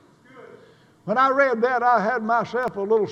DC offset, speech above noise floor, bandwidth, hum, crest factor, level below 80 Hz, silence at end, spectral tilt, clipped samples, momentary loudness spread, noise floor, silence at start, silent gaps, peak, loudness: under 0.1%; 32 dB; 8 kHz; none; 16 dB; -70 dBFS; 0 s; -6.5 dB/octave; under 0.1%; 8 LU; -52 dBFS; 0.35 s; none; -6 dBFS; -21 LUFS